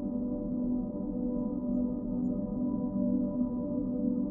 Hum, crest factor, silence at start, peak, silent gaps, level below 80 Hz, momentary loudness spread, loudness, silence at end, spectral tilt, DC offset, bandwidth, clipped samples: none; 12 dB; 0 s; -20 dBFS; none; -48 dBFS; 3 LU; -33 LUFS; 0 s; -14.5 dB/octave; under 0.1%; 1.5 kHz; under 0.1%